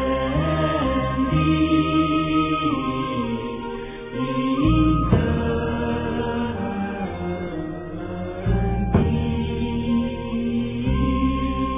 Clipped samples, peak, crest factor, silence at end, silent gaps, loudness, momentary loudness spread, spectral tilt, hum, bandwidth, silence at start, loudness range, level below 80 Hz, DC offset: under 0.1%; -4 dBFS; 18 dB; 0 s; none; -23 LUFS; 10 LU; -11.5 dB/octave; none; 3.8 kHz; 0 s; 4 LU; -32 dBFS; under 0.1%